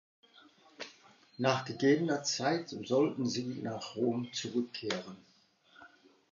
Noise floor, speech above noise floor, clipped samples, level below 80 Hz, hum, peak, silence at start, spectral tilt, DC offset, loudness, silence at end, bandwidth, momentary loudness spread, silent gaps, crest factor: -66 dBFS; 33 dB; under 0.1%; -80 dBFS; none; -14 dBFS; 0.8 s; -4.5 dB/octave; under 0.1%; -33 LUFS; 0.45 s; 7.6 kHz; 16 LU; none; 22 dB